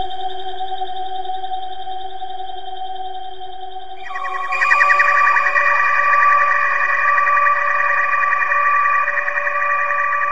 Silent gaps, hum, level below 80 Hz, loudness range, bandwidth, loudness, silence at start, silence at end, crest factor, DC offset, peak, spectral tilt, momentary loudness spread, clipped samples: none; none; -56 dBFS; 15 LU; 7.8 kHz; -15 LUFS; 0 s; 0 s; 18 dB; 5%; 0 dBFS; -2 dB/octave; 17 LU; under 0.1%